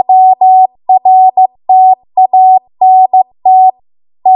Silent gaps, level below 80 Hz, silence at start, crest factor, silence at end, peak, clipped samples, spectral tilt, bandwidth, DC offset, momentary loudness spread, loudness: none; -66 dBFS; 0.1 s; 6 dB; 0 s; 0 dBFS; under 0.1%; -9 dB/octave; 1 kHz; under 0.1%; 4 LU; -7 LUFS